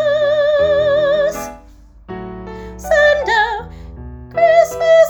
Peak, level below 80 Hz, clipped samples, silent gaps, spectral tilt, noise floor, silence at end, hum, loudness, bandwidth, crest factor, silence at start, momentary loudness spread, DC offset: 0 dBFS; -38 dBFS; under 0.1%; none; -4 dB/octave; -42 dBFS; 0 s; none; -14 LUFS; 19.5 kHz; 14 dB; 0 s; 20 LU; under 0.1%